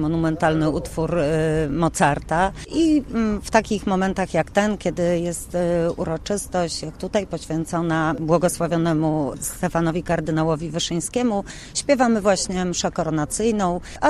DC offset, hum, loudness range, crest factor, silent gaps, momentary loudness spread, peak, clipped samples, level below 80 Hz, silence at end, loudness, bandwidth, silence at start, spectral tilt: under 0.1%; none; 2 LU; 20 dB; none; 6 LU; -2 dBFS; under 0.1%; -40 dBFS; 0 s; -22 LUFS; 13.5 kHz; 0 s; -5 dB/octave